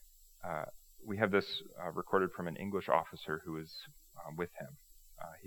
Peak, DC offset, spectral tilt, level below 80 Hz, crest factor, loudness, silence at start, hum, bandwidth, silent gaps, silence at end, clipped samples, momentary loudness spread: -12 dBFS; under 0.1%; -5.5 dB/octave; -68 dBFS; 26 dB; -37 LUFS; 0.05 s; none; over 20 kHz; none; 0 s; under 0.1%; 18 LU